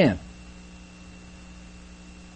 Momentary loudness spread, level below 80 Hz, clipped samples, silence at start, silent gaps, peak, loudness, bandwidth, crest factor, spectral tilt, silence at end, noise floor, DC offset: 12 LU; -48 dBFS; under 0.1%; 0 s; none; -6 dBFS; -28 LUFS; 8.4 kHz; 24 dB; -6.5 dB/octave; 0.85 s; -45 dBFS; under 0.1%